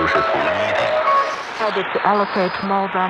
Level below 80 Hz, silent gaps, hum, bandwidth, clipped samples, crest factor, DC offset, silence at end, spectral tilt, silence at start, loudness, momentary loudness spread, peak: -54 dBFS; none; none; 10 kHz; under 0.1%; 16 dB; under 0.1%; 0 s; -5 dB/octave; 0 s; -18 LUFS; 5 LU; -4 dBFS